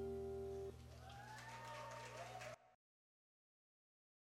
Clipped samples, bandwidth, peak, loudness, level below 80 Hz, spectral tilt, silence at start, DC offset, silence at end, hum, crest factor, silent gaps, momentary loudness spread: under 0.1%; 16 kHz; -40 dBFS; -53 LUFS; -68 dBFS; -5 dB/octave; 0 s; under 0.1%; 1.65 s; 60 Hz at -65 dBFS; 14 dB; none; 9 LU